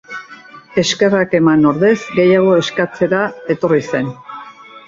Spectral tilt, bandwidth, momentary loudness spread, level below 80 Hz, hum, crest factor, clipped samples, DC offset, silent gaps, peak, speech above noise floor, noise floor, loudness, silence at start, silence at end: -5.5 dB/octave; 7.6 kHz; 18 LU; -54 dBFS; none; 14 dB; under 0.1%; under 0.1%; none; -2 dBFS; 25 dB; -38 dBFS; -14 LUFS; 0.1 s; 0.1 s